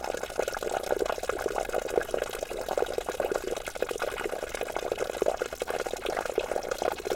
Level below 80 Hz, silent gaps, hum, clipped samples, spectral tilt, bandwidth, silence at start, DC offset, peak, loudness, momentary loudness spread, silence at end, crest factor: -50 dBFS; none; none; under 0.1%; -3 dB/octave; 17 kHz; 0 s; under 0.1%; -10 dBFS; -32 LUFS; 4 LU; 0 s; 22 dB